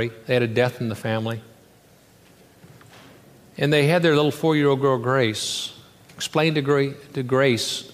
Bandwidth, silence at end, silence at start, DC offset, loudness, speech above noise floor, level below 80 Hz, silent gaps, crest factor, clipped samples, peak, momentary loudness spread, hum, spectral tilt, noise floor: 15.5 kHz; 0.05 s; 0 s; under 0.1%; -21 LUFS; 32 dB; -64 dBFS; none; 18 dB; under 0.1%; -4 dBFS; 11 LU; none; -5 dB/octave; -53 dBFS